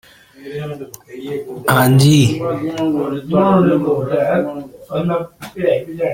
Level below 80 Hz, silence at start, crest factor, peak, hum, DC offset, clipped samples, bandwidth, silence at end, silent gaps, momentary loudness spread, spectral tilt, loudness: -50 dBFS; 0.4 s; 16 dB; 0 dBFS; none; under 0.1%; under 0.1%; 16.5 kHz; 0 s; none; 18 LU; -6.5 dB/octave; -16 LUFS